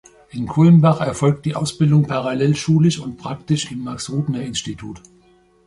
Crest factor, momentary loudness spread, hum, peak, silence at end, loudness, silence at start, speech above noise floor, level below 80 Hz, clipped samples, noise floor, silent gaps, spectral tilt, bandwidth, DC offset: 16 dB; 16 LU; none; -2 dBFS; 0.7 s; -18 LUFS; 0.35 s; 36 dB; -50 dBFS; under 0.1%; -54 dBFS; none; -6.5 dB/octave; 11.5 kHz; under 0.1%